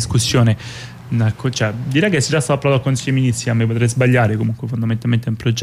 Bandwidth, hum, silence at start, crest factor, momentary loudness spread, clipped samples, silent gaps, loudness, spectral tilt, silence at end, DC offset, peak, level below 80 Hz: 14 kHz; none; 0 s; 12 dB; 7 LU; under 0.1%; none; -17 LUFS; -5.5 dB/octave; 0 s; under 0.1%; -4 dBFS; -44 dBFS